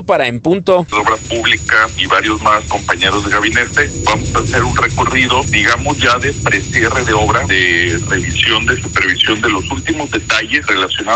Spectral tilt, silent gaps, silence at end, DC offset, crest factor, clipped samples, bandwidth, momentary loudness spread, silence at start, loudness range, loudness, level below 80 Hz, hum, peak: -3.5 dB/octave; none; 0 s; under 0.1%; 14 dB; under 0.1%; 9.4 kHz; 4 LU; 0 s; 1 LU; -12 LUFS; -30 dBFS; none; 0 dBFS